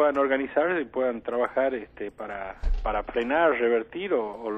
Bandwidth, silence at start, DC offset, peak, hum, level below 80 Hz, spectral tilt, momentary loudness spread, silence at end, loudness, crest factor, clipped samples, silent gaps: 5.8 kHz; 0 s; under 0.1%; -10 dBFS; none; -38 dBFS; -7.5 dB/octave; 12 LU; 0 s; -27 LUFS; 16 dB; under 0.1%; none